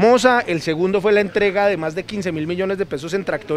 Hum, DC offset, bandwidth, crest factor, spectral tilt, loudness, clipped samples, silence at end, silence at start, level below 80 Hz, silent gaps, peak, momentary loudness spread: none; under 0.1%; 14 kHz; 18 dB; -5 dB/octave; -19 LUFS; under 0.1%; 0 s; 0 s; -52 dBFS; none; 0 dBFS; 9 LU